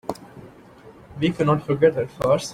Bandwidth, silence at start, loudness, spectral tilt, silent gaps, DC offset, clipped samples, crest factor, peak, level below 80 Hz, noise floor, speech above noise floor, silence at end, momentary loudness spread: 15.5 kHz; 0.1 s; -21 LUFS; -6.5 dB/octave; none; under 0.1%; under 0.1%; 20 dB; -4 dBFS; -52 dBFS; -46 dBFS; 26 dB; 0 s; 17 LU